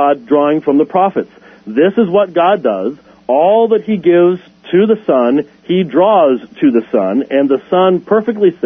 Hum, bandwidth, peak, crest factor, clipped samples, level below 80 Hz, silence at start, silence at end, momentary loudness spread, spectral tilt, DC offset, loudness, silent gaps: none; 3.7 kHz; 0 dBFS; 12 dB; under 0.1%; -60 dBFS; 0 s; 0 s; 7 LU; -9.5 dB/octave; under 0.1%; -12 LUFS; none